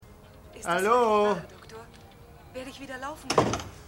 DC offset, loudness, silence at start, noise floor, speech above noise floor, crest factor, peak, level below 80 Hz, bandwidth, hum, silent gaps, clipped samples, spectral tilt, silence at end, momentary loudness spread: under 0.1%; -26 LUFS; 0.1 s; -50 dBFS; 24 dB; 22 dB; -8 dBFS; -54 dBFS; 16.5 kHz; none; none; under 0.1%; -4.5 dB/octave; 0 s; 23 LU